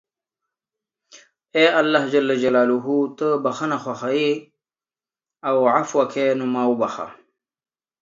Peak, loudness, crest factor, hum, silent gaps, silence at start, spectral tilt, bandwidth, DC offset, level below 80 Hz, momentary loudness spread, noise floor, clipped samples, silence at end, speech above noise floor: -2 dBFS; -20 LUFS; 20 dB; none; none; 1.15 s; -5 dB/octave; 7.6 kHz; under 0.1%; -72 dBFS; 8 LU; under -90 dBFS; under 0.1%; 0.9 s; over 71 dB